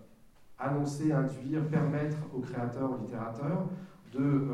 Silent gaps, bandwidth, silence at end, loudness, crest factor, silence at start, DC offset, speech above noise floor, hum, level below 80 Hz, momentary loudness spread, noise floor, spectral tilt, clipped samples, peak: none; 11 kHz; 0 s; -33 LUFS; 16 dB; 0 s; under 0.1%; 25 dB; none; -64 dBFS; 8 LU; -56 dBFS; -8.5 dB/octave; under 0.1%; -18 dBFS